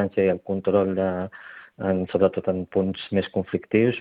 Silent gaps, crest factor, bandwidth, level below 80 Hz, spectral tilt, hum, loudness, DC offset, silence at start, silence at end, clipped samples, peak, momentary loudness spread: none; 18 dB; 4.9 kHz; -62 dBFS; -10.5 dB/octave; none; -24 LUFS; under 0.1%; 0 s; 0 s; under 0.1%; -6 dBFS; 9 LU